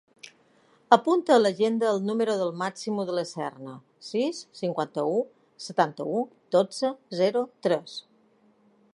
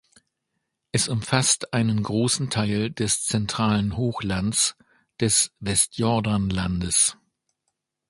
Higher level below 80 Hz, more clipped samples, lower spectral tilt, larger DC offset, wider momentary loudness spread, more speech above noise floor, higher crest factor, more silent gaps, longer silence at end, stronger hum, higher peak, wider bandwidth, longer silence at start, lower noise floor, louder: second, -82 dBFS vs -46 dBFS; neither; first, -5 dB/octave vs -3.5 dB/octave; neither; first, 14 LU vs 6 LU; second, 37 dB vs 56 dB; about the same, 24 dB vs 22 dB; neither; about the same, 0.95 s vs 0.95 s; neither; about the same, -2 dBFS vs -2 dBFS; about the same, 11.5 kHz vs 12 kHz; about the same, 0.9 s vs 0.95 s; second, -62 dBFS vs -79 dBFS; second, -26 LUFS vs -23 LUFS